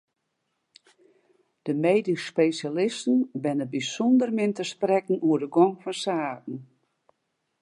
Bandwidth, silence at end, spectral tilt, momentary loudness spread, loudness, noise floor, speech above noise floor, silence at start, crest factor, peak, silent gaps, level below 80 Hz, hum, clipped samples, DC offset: 11 kHz; 1 s; -5.5 dB/octave; 9 LU; -25 LUFS; -78 dBFS; 54 dB; 1.65 s; 18 dB; -8 dBFS; none; -82 dBFS; none; under 0.1%; under 0.1%